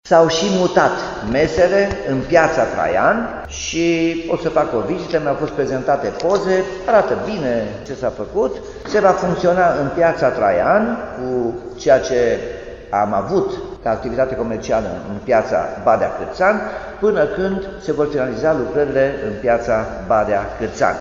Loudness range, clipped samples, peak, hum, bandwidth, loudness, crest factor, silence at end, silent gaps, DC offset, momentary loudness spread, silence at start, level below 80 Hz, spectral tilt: 3 LU; under 0.1%; 0 dBFS; none; 7.6 kHz; -18 LUFS; 18 dB; 0 s; none; under 0.1%; 9 LU; 0.05 s; -40 dBFS; -5.5 dB/octave